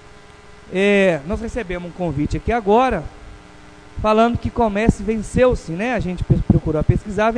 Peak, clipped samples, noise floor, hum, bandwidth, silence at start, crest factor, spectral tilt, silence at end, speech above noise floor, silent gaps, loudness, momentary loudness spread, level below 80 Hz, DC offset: 0 dBFS; under 0.1%; -43 dBFS; none; 10.5 kHz; 0.45 s; 18 dB; -7 dB/octave; 0 s; 25 dB; none; -19 LUFS; 10 LU; -30 dBFS; under 0.1%